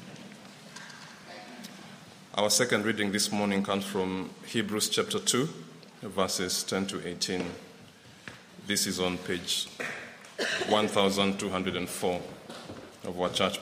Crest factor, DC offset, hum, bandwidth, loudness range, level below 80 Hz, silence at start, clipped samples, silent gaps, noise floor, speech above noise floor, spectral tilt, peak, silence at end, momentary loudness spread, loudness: 22 dB; under 0.1%; none; 15.5 kHz; 4 LU; -68 dBFS; 0 s; under 0.1%; none; -52 dBFS; 23 dB; -3 dB/octave; -10 dBFS; 0 s; 20 LU; -29 LUFS